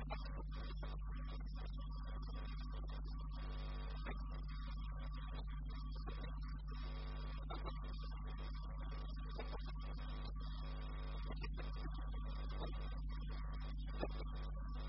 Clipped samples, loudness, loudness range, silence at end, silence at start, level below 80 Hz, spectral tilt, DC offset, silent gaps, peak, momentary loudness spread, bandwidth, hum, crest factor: under 0.1%; -49 LUFS; 1 LU; 0 s; 0 s; -46 dBFS; -5.5 dB/octave; under 0.1%; none; -28 dBFS; 2 LU; 5.8 kHz; 50 Hz at -45 dBFS; 18 dB